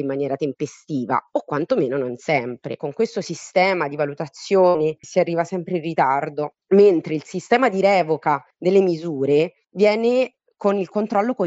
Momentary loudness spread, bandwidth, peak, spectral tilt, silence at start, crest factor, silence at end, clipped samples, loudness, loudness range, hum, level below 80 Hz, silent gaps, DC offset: 10 LU; 8 kHz; -4 dBFS; -6 dB/octave; 0 s; 16 dB; 0 s; under 0.1%; -21 LUFS; 4 LU; none; -68 dBFS; none; under 0.1%